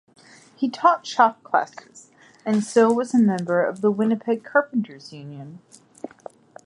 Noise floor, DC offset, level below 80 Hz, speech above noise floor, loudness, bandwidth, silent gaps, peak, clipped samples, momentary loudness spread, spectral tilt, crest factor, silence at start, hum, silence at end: -45 dBFS; under 0.1%; -74 dBFS; 23 dB; -21 LUFS; 11 kHz; none; -4 dBFS; under 0.1%; 21 LU; -6 dB/octave; 20 dB; 0.6 s; none; 0.6 s